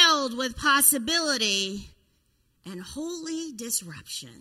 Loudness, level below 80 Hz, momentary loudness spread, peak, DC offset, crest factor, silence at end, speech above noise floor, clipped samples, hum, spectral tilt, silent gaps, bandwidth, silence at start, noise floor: -24 LUFS; -56 dBFS; 19 LU; -4 dBFS; under 0.1%; 22 dB; 0.05 s; 41 dB; under 0.1%; none; -0.5 dB/octave; none; 16 kHz; 0 s; -68 dBFS